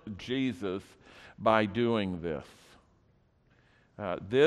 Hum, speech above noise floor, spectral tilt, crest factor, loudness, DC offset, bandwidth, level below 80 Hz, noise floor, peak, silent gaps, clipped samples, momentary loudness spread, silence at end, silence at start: none; 37 dB; -6.5 dB/octave; 22 dB; -32 LUFS; under 0.1%; 12 kHz; -62 dBFS; -67 dBFS; -10 dBFS; none; under 0.1%; 18 LU; 0 s; 0.05 s